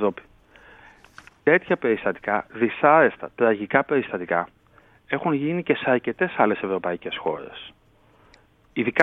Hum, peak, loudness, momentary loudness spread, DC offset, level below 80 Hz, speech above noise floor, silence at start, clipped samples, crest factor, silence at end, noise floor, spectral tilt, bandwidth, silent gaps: none; 0 dBFS; -23 LUFS; 12 LU; under 0.1%; -62 dBFS; 35 dB; 0 s; under 0.1%; 24 dB; 0 s; -57 dBFS; -7.5 dB/octave; 6 kHz; none